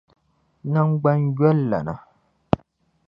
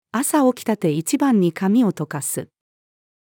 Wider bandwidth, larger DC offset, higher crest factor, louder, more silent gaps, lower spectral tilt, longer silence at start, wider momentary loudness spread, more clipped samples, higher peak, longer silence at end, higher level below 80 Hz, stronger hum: second, 5.4 kHz vs 19 kHz; neither; first, 22 dB vs 14 dB; about the same, -21 LUFS vs -20 LUFS; neither; first, -11 dB/octave vs -5.5 dB/octave; first, 0.65 s vs 0.15 s; first, 14 LU vs 8 LU; neither; first, 0 dBFS vs -6 dBFS; second, 0.5 s vs 0.85 s; first, -50 dBFS vs -74 dBFS; neither